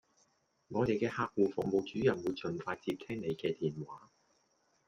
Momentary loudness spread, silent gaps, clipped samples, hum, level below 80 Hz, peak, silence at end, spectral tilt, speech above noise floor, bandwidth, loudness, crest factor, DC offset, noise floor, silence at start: 8 LU; none; under 0.1%; none; -68 dBFS; -18 dBFS; 0.9 s; -7 dB/octave; 40 dB; 12 kHz; -35 LUFS; 20 dB; under 0.1%; -75 dBFS; 0.7 s